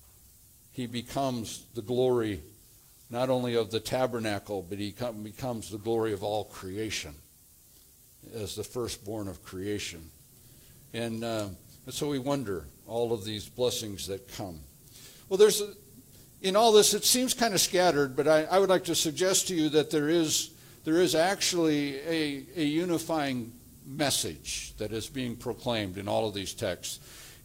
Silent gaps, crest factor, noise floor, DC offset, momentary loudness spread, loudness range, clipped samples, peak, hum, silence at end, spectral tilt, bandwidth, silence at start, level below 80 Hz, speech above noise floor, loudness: none; 22 dB; -58 dBFS; under 0.1%; 15 LU; 13 LU; under 0.1%; -8 dBFS; none; 0.1 s; -3.5 dB/octave; 16.5 kHz; 0.75 s; -60 dBFS; 29 dB; -29 LUFS